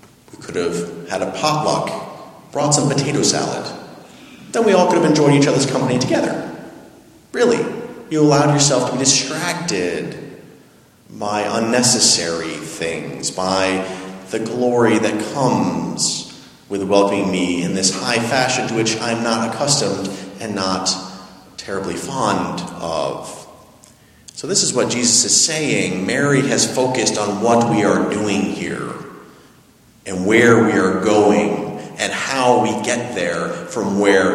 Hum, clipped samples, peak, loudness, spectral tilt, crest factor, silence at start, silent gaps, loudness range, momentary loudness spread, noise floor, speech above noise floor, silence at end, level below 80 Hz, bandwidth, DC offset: none; under 0.1%; 0 dBFS; -17 LUFS; -3.5 dB/octave; 18 dB; 0.4 s; none; 5 LU; 15 LU; -49 dBFS; 33 dB; 0 s; -56 dBFS; 15 kHz; under 0.1%